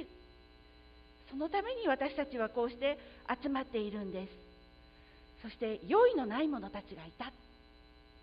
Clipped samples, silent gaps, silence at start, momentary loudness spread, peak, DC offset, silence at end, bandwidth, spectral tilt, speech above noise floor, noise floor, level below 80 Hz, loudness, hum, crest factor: under 0.1%; none; 0 s; 18 LU; -16 dBFS; under 0.1%; 0.75 s; 5.2 kHz; -3.5 dB/octave; 25 dB; -60 dBFS; -62 dBFS; -35 LUFS; none; 20 dB